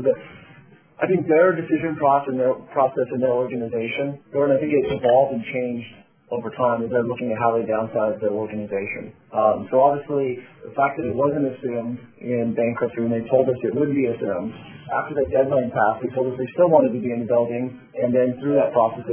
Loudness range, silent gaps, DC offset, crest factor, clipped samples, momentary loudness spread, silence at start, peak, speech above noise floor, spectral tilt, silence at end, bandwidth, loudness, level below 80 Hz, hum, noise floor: 3 LU; none; under 0.1%; 18 dB; under 0.1%; 10 LU; 0 s; -2 dBFS; 28 dB; -11 dB/octave; 0 s; 3.5 kHz; -22 LUFS; -56 dBFS; none; -49 dBFS